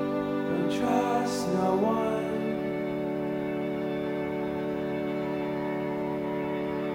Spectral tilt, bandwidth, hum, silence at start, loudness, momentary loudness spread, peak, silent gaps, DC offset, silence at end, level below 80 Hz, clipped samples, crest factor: -6.5 dB/octave; 16 kHz; none; 0 s; -29 LUFS; 5 LU; -12 dBFS; none; under 0.1%; 0 s; -58 dBFS; under 0.1%; 16 dB